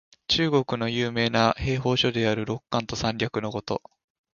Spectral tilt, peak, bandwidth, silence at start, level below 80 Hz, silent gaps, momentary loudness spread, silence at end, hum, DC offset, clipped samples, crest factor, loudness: -5 dB/octave; -4 dBFS; 7.2 kHz; 0.3 s; -48 dBFS; none; 8 LU; 0.55 s; none; under 0.1%; under 0.1%; 22 dB; -25 LUFS